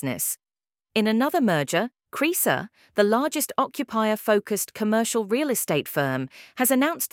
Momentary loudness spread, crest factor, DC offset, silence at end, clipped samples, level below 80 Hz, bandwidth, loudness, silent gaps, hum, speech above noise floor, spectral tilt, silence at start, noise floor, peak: 7 LU; 18 dB; under 0.1%; 0.05 s; under 0.1%; -70 dBFS; 18 kHz; -24 LUFS; none; none; over 66 dB; -4 dB/octave; 0 s; under -90 dBFS; -6 dBFS